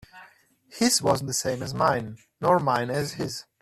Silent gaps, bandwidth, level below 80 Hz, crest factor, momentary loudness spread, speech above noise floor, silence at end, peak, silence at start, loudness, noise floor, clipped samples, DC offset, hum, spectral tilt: none; 15.5 kHz; -58 dBFS; 18 dB; 9 LU; 31 dB; 0.2 s; -8 dBFS; 0.15 s; -25 LUFS; -57 dBFS; under 0.1%; under 0.1%; none; -4 dB/octave